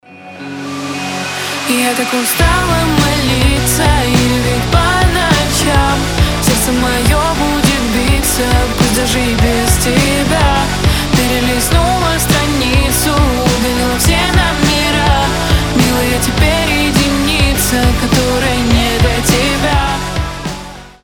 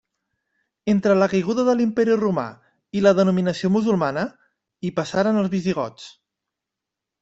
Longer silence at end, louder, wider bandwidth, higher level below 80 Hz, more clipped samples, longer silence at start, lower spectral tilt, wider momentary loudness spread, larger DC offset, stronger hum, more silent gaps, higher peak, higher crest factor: second, 0.15 s vs 1.1 s; first, -12 LUFS vs -21 LUFS; first, over 20 kHz vs 8 kHz; first, -20 dBFS vs -60 dBFS; neither; second, 0.1 s vs 0.85 s; second, -4 dB/octave vs -7 dB/octave; second, 5 LU vs 13 LU; neither; neither; neither; first, 0 dBFS vs -4 dBFS; second, 12 dB vs 18 dB